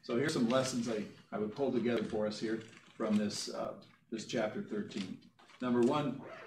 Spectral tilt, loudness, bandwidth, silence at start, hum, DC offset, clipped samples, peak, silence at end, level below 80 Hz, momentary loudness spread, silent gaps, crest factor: -5 dB/octave; -36 LUFS; 14.5 kHz; 0.05 s; none; under 0.1%; under 0.1%; -18 dBFS; 0 s; -74 dBFS; 12 LU; none; 18 dB